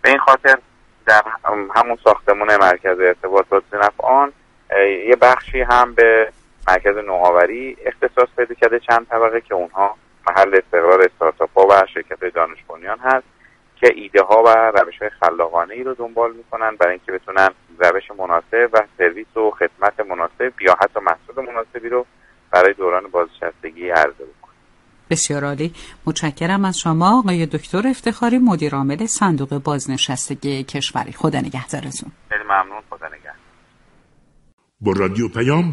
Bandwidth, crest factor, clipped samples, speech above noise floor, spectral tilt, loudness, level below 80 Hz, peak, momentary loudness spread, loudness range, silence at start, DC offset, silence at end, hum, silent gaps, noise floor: 11.5 kHz; 16 dB; under 0.1%; 37 dB; -4.5 dB/octave; -16 LUFS; -44 dBFS; 0 dBFS; 12 LU; 7 LU; 0.05 s; under 0.1%; 0 s; none; 34.53-34.58 s; -54 dBFS